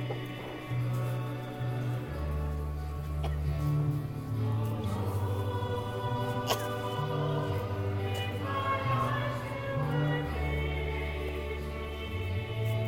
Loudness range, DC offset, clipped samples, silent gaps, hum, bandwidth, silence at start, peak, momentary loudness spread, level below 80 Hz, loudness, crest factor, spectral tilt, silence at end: 2 LU; under 0.1%; under 0.1%; none; none; 17 kHz; 0 s; -14 dBFS; 6 LU; -42 dBFS; -33 LUFS; 18 dB; -6.5 dB/octave; 0 s